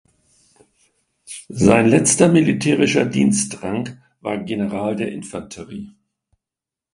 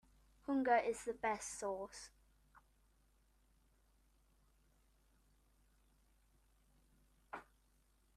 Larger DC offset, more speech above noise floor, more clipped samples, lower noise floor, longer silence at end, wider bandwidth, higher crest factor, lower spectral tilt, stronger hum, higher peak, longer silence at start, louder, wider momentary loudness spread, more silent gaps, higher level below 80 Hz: neither; first, 70 dB vs 35 dB; neither; first, -88 dBFS vs -75 dBFS; first, 1.05 s vs 0.75 s; second, 11.5 kHz vs 13.5 kHz; about the same, 20 dB vs 24 dB; first, -5 dB/octave vs -3.5 dB/octave; neither; first, 0 dBFS vs -22 dBFS; first, 1.3 s vs 0.5 s; first, -17 LUFS vs -40 LUFS; about the same, 20 LU vs 20 LU; neither; first, -50 dBFS vs -72 dBFS